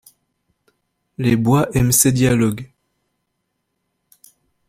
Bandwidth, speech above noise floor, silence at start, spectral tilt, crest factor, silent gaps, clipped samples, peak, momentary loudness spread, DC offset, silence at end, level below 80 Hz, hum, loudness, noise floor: 16 kHz; 58 dB; 1.2 s; -5 dB/octave; 20 dB; none; under 0.1%; 0 dBFS; 12 LU; under 0.1%; 2.05 s; -44 dBFS; none; -16 LUFS; -74 dBFS